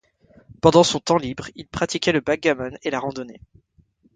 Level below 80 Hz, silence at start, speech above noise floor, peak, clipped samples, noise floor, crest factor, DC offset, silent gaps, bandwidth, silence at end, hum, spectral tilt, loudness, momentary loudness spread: -50 dBFS; 0.65 s; 39 dB; 0 dBFS; under 0.1%; -60 dBFS; 22 dB; under 0.1%; none; 9.6 kHz; 0.85 s; none; -4.5 dB/octave; -21 LUFS; 17 LU